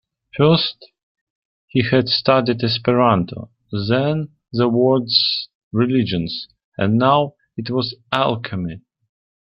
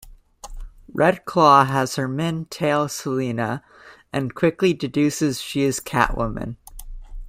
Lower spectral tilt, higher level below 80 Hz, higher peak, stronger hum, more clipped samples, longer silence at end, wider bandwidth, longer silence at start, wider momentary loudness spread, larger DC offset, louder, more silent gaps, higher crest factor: first, -8.5 dB/octave vs -5.5 dB/octave; second, -54 dBFS vs -40 dBFS; about the same, -2 dBFS vs -2 dBFS; neither; neither; first, 0.65 s vs 0 s; second, 6 kHz vs 16 kHz; first, 0.35 s vs 0.05 s; second, 13 LU vs 18 LU; neither; first, -18 LUFS vs -21 LUFS; first, 1.03-1.15 s, 1.21-1.68 s, 5.55-5.71 s, 6.64-6.72 s vs none; about the same, 18 dB vs 20 dB